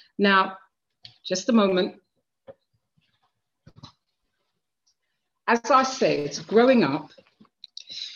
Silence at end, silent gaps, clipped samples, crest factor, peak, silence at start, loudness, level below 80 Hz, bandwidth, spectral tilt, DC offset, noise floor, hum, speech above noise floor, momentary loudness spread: 0 s; none; under 0.1%; 20 dB; -6 dBFS; 0.2 s; -22 LUFS; -70 dBFS; 7.4 kHz; -4.5 dB/octave; under 0.1%; -80 dBFS; none; 58 dB; 17 LU